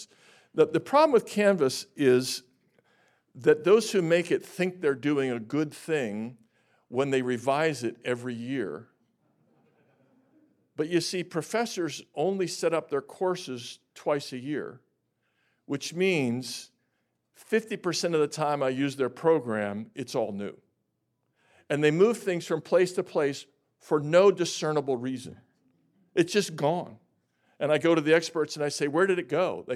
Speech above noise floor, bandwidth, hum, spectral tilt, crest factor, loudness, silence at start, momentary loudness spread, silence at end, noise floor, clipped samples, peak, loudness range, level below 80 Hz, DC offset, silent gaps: 51 dB; 14.5 kHz; none; -5 dB/octave; 18 dB; -27 LUFS; 0 s; 13 LU; 0 s; -78 dBFS; under 0.1%; -10 dBFS; 7 LU; -82 dBFS; under 0.1%; none